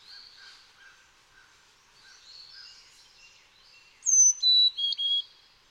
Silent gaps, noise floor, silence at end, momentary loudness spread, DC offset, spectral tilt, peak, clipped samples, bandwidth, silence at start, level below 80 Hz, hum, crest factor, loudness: none; -60 dBFS; 0.5 s; 28 LU; under 0.1%; 6 dB/octave; -12 dBFS; under 0.1%; 16 kHz; 2.6 s; -74 dBFS; none; 18 dB; -21 LUFS